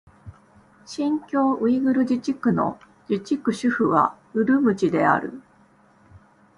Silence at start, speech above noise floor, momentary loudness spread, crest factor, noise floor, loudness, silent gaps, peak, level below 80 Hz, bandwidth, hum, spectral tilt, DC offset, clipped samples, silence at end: 0.25 s; 35 dB; 9 LU; 18 dB; -56 dBFS; -22 LUFS; none; -4 dBFS; -60 dBFS; 11 kHz; none; -7 dB/octave; under 0.1%; under 0.1%; 0.4 s